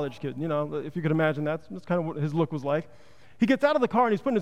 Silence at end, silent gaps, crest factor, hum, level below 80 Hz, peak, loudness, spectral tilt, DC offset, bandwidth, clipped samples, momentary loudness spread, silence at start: 0 s; none; 16 dB; none; -66 dBFS; -10 dBFS; -27 LUFS; -8 dB/octave; 0.4%; 10.5 kHz; under 0.1%; 9 LU; 0 s